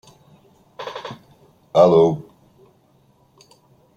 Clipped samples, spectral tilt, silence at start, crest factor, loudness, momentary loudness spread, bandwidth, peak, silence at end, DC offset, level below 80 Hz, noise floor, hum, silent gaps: under 0.1%; -7.5 dB/octave; 0.8 s; 20 dB; -17 LUFS; 23 LU; 7.6 kHz; -2 dBFS; 1.75 s; under 0.1%; -62 dBFS; -57 dBFS; none; none